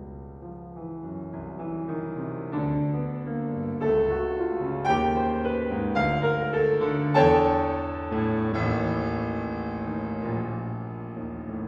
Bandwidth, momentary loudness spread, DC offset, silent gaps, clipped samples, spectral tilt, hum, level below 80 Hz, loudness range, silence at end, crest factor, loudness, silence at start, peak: 7.2 kHz; 13 LU; under 0.1%; none; under 0.1%; -8.5 dB/octave; none; -44 dBFS; 7 LU; 0 s; 20 dB; -27 LUFS; 0 s; -6 dBFS